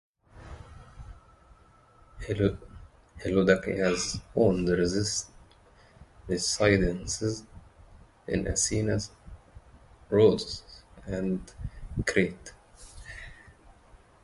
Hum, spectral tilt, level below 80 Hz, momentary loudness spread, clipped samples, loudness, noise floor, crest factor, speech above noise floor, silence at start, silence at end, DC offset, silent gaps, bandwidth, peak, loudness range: none; -4.5 dB/octave; -46 dBFS; 24 LU; under 0.1%; -28 LUFS; -58 dBFS; 24 dB; 31 dB; 0.35 s; 0.3 s; under 0.1%; none; 11.5 kHz; -6 dBFS; 6 LU